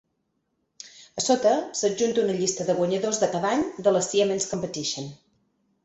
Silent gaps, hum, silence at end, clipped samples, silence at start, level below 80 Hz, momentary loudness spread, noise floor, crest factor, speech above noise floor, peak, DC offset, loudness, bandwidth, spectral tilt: none; none; 0.7 s; under 0.1%; 0.85 s; -64 dBFS; 14 LU; -75 dBFS; 18 dB; 51 dB; -8 dBFS; under 0.1%; -24 LUFS; 8.4 kHz; -3.5 dB/octave